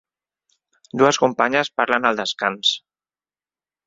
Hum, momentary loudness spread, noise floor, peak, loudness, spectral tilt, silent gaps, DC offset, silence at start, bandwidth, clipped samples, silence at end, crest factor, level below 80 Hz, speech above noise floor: none; 6 LU; under -90 dBFS; 0 dBFS; -19 LUFS; -3 dB/octave; none; under 0.1%; 0.95 s; 7.8 kHz; under 0.1%; 1.1 s; 22 dB; -66 dBFS; over 71 dB